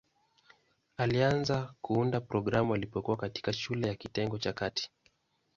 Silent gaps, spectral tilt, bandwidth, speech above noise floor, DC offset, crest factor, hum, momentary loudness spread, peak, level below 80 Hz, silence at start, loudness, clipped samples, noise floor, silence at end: none; -6 dB/octave; 7.6 kHz; 40 dB; under 0.1%; 20 dB; none; 7 LU; -14 dBFS; -58 dBFS; 1 s; -32 LUFS; under 0.1%; -72 dBFS; 0.7 s